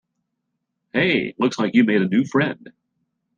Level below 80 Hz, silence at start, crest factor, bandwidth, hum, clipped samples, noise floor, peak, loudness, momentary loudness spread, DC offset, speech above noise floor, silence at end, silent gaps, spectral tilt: -62 dBFS; 0.95 s; 18 dB; 7.6 kHz; none; under 0.1%; -77 dBFS; -4 dBFS; -20 LUFS; 8 LU; under 0.1%; 58 dB; 0.7 s; none; -6 dB/octave